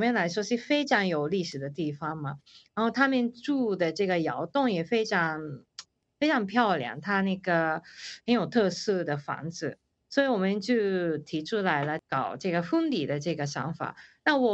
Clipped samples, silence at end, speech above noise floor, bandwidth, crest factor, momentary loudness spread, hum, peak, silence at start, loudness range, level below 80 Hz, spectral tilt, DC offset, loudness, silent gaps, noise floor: under 0.1%; 0 s; 23 dB; 8.2 kHz; 20 dB; 11 LU; none; -8 dBFS; 0 s; 2 LU; -70 dBFS; -5.5 dB/octave; under 0.1%; -28 LUFS; none; -51 dBFS